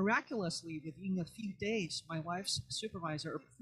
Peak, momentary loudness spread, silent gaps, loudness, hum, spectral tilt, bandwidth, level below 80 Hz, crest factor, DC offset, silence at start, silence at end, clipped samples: -20 dBFS; 7 LU; none; -39 LUFS; none; -4 dB/octave; 13 kHz; -68 dBFS; 20 dB; under 0.1%; 0 s; 0.2 s; under 0.1%